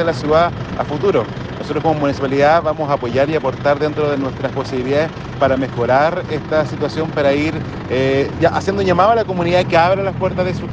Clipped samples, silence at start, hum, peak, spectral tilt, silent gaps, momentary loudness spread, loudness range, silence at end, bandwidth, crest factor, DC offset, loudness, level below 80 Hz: under 0.1%; 0 s; none; 0 dBFS; -7 dB/octave; none; 8 LU; 2 LU; 0 s; 8.8 kHz; 16 dB; under 0.1%; -17 LUFS; -42 dBFS